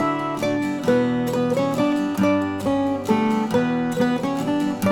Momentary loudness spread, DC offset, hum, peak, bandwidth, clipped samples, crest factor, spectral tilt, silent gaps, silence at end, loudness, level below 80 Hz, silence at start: 3 LU; under 0.1%; none; -6 dBFS; 18 kHz; under 0.1%; 14 dB; -6.5 dB/octave; none; 0 s; -21 LUFS; -56 dBFS; 0 s